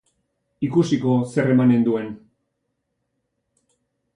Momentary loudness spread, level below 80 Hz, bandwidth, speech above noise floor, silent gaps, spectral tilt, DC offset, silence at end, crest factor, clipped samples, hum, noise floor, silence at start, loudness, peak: 13 LU; -62 dBFS; 10.5 kHz; 57 dB; none; -8 dB/octave; under 0.1%; 2 s; 16 dB; under 0.1%; none; -76 dBFS; 0.6 s; -20 LUFS; -6 dBFS